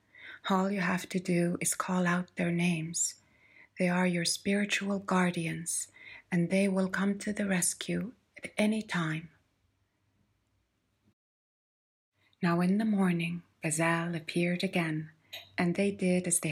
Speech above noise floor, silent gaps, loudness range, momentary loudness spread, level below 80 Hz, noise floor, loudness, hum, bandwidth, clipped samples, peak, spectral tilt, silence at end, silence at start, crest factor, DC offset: 46 dB; 11.13-12.12 s; 7 LU; 8 LU; -72 dBFS; -76 dBFS; -31 LUFS; none; 16 kHz; under 0.1%; -14 dBFS; -4.5 dB/octave; 0 s; 0.2 s; 16 dB; under 0.1%